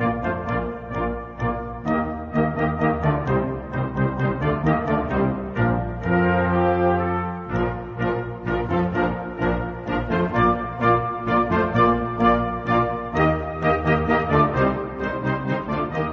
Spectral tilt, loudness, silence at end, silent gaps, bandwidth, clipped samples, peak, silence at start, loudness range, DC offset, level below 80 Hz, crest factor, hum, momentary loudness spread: -9 dB/octave; -22 LUFS; 0 s; none; 6.8 kHz; under 0.1%; -4 dBFS; 0 s; 4 LU; under 0.1%; -38 dBFS; 16 dB; none; 7 LU